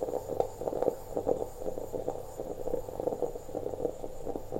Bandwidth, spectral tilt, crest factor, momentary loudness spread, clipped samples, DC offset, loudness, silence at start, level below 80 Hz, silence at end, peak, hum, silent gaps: 16 kHz; -6.5 dB/octave; 22 dB; 7 LU; under 0.1%; under 0.1%; -36 LUFS; 0 s; -48 dBFS; 0 s; -12 dBFS; none; none